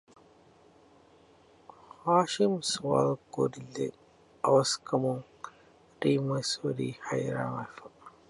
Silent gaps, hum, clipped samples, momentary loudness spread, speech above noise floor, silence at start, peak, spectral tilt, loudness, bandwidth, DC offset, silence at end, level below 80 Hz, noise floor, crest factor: none; none; under 0.1%; 14 LU; 31 dB; 2.05 s; -12 dBFS; -5 dB/octave; -30 LUFS; 11.5 kHz; under 0.1%; 0.2 s; -70 dBFS; -60 dBFS; 20 dB